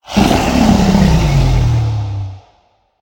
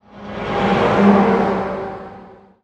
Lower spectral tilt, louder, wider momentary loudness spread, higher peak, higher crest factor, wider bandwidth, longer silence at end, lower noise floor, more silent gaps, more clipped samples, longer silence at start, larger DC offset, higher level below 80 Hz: about the same, -6.5 dB/octave vs -7.5 dB/octave; first, -12 LUFS vs -16 LUFS; second, 11 LU vs 20 LU; about the same, 0 dBFS vs -2 dBFS; about the same, 12 dB vs 16 dB; first, 17 kHz vs 8 kHz; first, 0.65 s vs 0.3 s; first, -55 dBFS vs -41 dBFS; neither; neither; about the same, 0.1 s vs 0.15 s; neither; first, -20 dBFS vs -42 dBFS